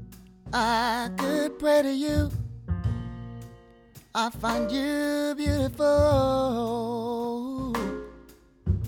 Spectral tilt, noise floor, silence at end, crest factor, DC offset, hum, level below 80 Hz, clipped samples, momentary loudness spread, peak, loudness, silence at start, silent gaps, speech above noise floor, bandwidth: -6 dB/octave; -52 dBFS; 0 s; 16 dB; under 0.1%; none; -40 dBFS; under 0.1%; 13 LU; -10 dBFS; -27 LUFS; 0 s; none; 27 dB; 19 kHz